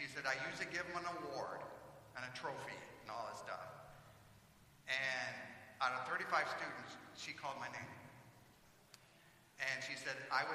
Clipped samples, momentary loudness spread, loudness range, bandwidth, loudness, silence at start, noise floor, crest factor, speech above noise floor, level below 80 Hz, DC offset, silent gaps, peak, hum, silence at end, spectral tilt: under 0.1%; 23 LU; 7 LU; 15.5 kHz; -44 LUFS; 0 s; -67 dBFS; 24 dB; 23 dB; -78 dBFS; under 0.1%; none; -22 dBFS; none; 0 s; -3 dB/octave